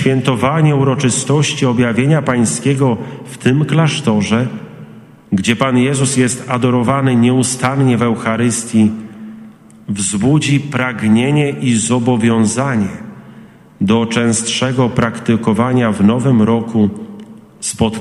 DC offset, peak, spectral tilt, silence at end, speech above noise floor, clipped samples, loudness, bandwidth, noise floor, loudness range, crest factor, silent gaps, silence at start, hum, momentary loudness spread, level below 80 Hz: under 0.1%; 0 dBFS; -5.5 dB/octave; 0 s; 26 dB; under 0.1%; -14 LUFS; 12.5 kHz; -39 dBFS; 2 LU; 14 dB; none; 0 s; none; 10 LU; -48 dBFS